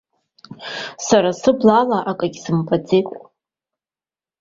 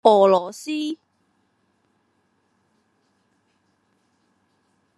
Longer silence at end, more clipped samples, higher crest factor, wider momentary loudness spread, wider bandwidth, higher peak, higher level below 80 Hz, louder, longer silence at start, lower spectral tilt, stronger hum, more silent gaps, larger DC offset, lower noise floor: second, 1.2 s vs 4.05 s; neither; second, 18 dB vs 24 dB; about the same, 16 LU vs 16 LU; second, 7.8 kHz vs 12.5 kHz; about the same, 0 dBFS vs 0 dBFS; first, -58 dBFS vs -80 dBFS; about the same, -18 LUFS vs -20 LUFS; first, 0.5 s vs 0.05 s; about the same, -5.5 dB/octave vs -5.5 dB/octave; neither; neither; neither; first, under -90 dBFS vs -68 dBFS